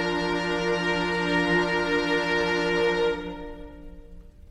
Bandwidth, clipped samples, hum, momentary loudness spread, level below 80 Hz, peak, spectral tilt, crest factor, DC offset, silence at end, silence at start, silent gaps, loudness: 12 kHz; under 0.1%; none; 15 LU; -46 dBFS; -12 dBFS; -5 dB/octave; 14 dB; under 0.1%; 0 s; 0 s; none; -24 LUFS